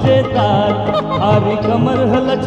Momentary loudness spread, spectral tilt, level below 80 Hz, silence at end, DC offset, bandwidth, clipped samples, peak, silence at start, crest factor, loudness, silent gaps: 2 LU; -8 dB/octave; -38 dBFS; 0 s; under 0.1%; 8.2 kHz; under 0.1%; -2 dBFS; 0 s; 12 dB; -14 LUFS; none